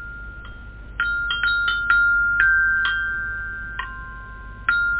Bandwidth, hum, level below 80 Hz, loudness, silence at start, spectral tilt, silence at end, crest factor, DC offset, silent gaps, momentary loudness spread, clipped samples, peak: 4 kHz; none; -38 dBFS; -20 LUFS; 0 s; -5.5 dB/octave; 0 s; 18 dB; under 0.1%; none; 21 LU; under 0.1%; -4 dBFS